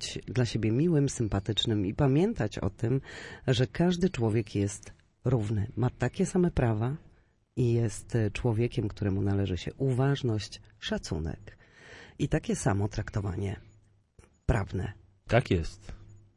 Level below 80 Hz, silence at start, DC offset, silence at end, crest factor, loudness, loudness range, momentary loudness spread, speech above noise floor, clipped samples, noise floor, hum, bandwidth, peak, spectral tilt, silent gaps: -46 dBFS; 0 s; under 0.1%; 0.2 s; 18 dB; -30 LUFS; 5 LU; 12 LU; 33 dB; under 0.1%; -62 dBFS; none; 11 kHz; -10 dBFS; -6.5 dB/octave; none